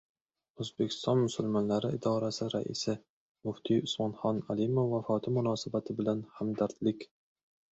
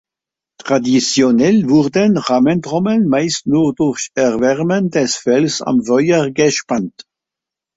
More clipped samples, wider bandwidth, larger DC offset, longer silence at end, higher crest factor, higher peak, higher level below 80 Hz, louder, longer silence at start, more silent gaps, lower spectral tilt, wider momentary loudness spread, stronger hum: neither; about the same, 8.2 kHz vs 8 kHz; neither; second, 0.7 s vs 0.9 s; about the same, 18 dB vs 14 dB; second, -16 dBFS vs -2 dBFS; second, -68 dBFS vs -54 dBFS; second, -33 LUFS vs -14 LUFS; about the same, 0.6 s vs 0.6 s; first, 3.10-3.35 s vs none; first, -6.5 dB/octave vs -5 dB/octave; first, 10 LU vs 6 LU; neither